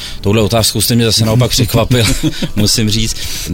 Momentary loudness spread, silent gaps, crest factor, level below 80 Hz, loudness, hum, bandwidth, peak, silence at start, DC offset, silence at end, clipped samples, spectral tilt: 6 LU; none; 12 dB; -24 dBFS; -12 LUFS; none; 17.5 kHz; 0 dBFS; 0 s; under 0.1%; 0 s; under 0.1%; -4 dB/octave